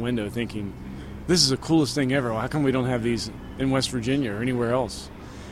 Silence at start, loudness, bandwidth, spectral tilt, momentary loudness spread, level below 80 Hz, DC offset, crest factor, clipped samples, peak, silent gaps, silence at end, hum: 0 s; -24 LUFS; 15.5 kHz; -4.5 dB/octave; 16 LU; -44 dBFS; under 0.1%; 22 dB; under 0.1%; -4 dBFS; none; 0 s; none